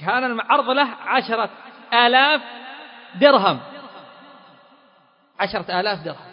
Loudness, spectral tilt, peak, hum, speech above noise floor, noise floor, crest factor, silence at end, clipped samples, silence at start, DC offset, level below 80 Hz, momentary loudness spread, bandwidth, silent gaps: -19 LUFS; -8.5 dB/octave; 0 dBFS; none; 38 dB; -57 dBFS; 20 dB; 0 s; under 0.1%; 0 s; under 0.1%; -64 dBFS; 22 LU; 5.4 kHz; none